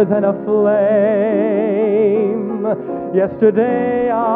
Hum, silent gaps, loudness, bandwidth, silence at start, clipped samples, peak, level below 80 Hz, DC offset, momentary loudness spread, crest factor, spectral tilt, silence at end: none; none; -16 LUFS; 3.8 kHz; 0 s; under 0.1%; -2 dBFS; -56 dBFS; under 0.1%; 6 LU; 14 dB; -11.5 dB/octave; 0 s